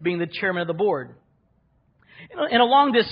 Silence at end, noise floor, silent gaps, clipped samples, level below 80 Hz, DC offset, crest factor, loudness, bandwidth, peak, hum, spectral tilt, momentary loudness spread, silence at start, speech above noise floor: 0 s; -64 dBFS; none; under 0.1%; -64 dBFS; under 0.1%; 18 dB; -21 LUFS; 5.4 kHz; -6 dBFS; none; -9.5 dB/octave; 15 LU; 0 s; 43 dB